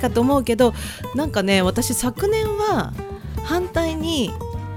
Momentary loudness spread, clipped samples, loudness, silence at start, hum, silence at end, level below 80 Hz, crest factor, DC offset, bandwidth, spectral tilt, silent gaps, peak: 12 LU; under 0.1%; -21 LUFS; 0 s; none; 0 s; -36 dBFS; 18 dB; under 0.1%; 17.5 kHz; -5 dB/octave; none; -2 dBFS